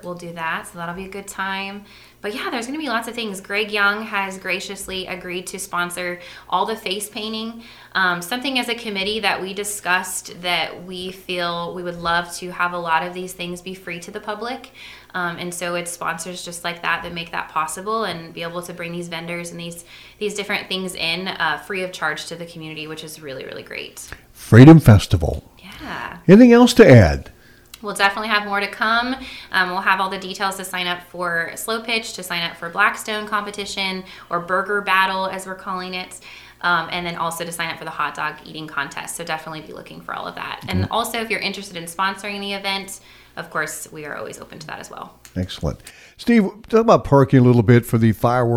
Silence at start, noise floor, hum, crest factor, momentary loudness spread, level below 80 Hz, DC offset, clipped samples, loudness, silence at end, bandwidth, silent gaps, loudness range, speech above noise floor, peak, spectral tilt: 0.05 s; -45 dBFS; none; 20 dB; 17 LU; -42 dBFS; under 0.1%; under 0.1%; -19 LUFS; 0 s; 16.5 kHz; none; 12 LU; 25 dB; 0 dBFS; -5.5 dB/octave